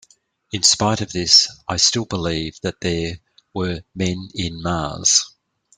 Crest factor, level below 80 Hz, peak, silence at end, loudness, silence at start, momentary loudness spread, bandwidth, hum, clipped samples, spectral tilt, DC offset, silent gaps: 22 dB; -46 dBFS; 0 dBFS; 0.5 s; -18 LUFS; 0.55 s; 14 LU; 11.5 kHz; none; under 0.1%; -2.5 dB/octave; under 0.1%; none